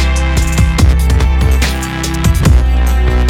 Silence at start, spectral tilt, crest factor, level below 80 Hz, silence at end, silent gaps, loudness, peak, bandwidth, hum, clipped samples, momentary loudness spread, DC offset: 0 s; -5.5 dB/octave; 10 dB; -12 dBFS; 0 s; none; -12 LUFS; 0 dBFS; 16 kHz; none; under 0.1%; 4 LU; under 0.1%